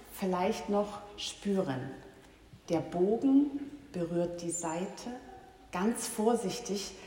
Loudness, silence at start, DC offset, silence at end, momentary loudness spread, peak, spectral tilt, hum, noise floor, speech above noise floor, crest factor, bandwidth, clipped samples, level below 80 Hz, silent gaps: -33 LUFS; 0 s; under 0.1%; 0 s; 15 LU; -16 dBFS; -5 dB/octave; none; -56 dBFS; 24 dB; 18 dB; 16 kHz; under 0.1%; -62 dBFS; none